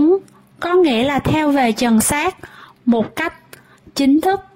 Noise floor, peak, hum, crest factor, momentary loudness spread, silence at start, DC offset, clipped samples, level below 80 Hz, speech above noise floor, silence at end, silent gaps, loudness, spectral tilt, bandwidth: -44 dBFS; -4 dBFS; none; 12 dB; 9 LU; 0 s; under 0.1%; under 0.1%; -44 dBFS; 28 dB; 0.15 s; none; -17 LUFS; -4.5 dB/octave; 16.5 kHz